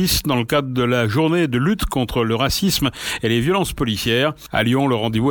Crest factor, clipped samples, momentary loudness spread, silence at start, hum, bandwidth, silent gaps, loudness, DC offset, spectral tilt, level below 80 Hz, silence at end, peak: 14 dB; under 0.1%; 3 LU; 0 s; none; 19 kHz; none; -19 LUFS; under 0.1%; -5 dB/octave; -36 dBFS; 0 s; -4 dBFS